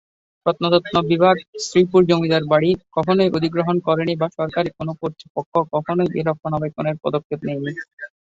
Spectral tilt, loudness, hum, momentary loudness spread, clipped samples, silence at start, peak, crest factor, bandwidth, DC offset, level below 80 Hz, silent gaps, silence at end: -6.5 dB/octave; -20 LUFS; none; 11 LU; under 0.1%; 0.45 s; -2 dBFS; 18 dB; 8 kHz; under 0.1%; -56 dBFS; 1.48-1.53 s, 5.30-5.35 s, 5.46-5.52 s, 7.24-7.30 s, 7.93-7.97 s; 0.2 s